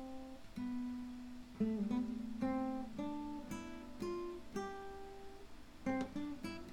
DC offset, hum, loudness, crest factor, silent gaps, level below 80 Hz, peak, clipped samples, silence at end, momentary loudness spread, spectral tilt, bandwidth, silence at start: under 0.1%; none; -44 LUFS; 16 dB; none; -60 dBFS; -26 dBFS; under 0.1%; 0 s; 14 LU; -6.5 dB/octave; 16 kHz; 0 s